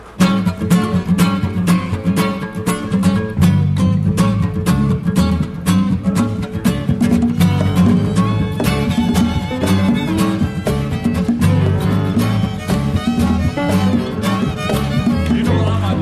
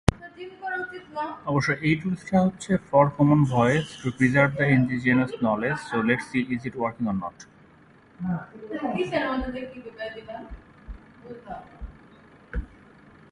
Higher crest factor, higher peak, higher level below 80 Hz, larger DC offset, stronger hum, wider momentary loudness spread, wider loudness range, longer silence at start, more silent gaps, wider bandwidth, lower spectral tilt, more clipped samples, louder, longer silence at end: second, 12 dB vs 26 dB; about the same, -2 dBFS vs 0 dBFS; first, -32 dBFS vs -44 dBFS; neither; neither; second, 4 LU vs 21 LU; second, 1 LU vs 15 LU; about the same, 0 s vs 0.1 s; neither; first, 15 kHz vs 11.5 kHz; about the same, -7 dB/octave vs -7 dB/octave; neither; first, -16 LUFS vs -24 LUFS; second, 0 s vs 0.65 s